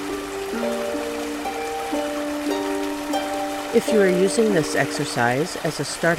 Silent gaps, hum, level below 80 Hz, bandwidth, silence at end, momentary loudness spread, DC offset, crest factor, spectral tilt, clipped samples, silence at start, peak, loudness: none; none; -52 dBFS; 16 kHz; 0 s; 9 LU; under 0.1%; 18 dB; -4.5 dB/octave; under 0.1%; 0 s; -6 dBFS; -23 LUFS